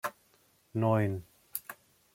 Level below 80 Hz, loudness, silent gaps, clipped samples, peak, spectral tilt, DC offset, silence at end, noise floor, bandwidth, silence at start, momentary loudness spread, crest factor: -70 dBFS; -33 LUFS; none; under 0.1%; -14 dBFS; -7 dB/octave; under 0.1%; 0.4 s; -68 dBFS; 16.5 kHz; 0.05 s; 18 LU; 22 dB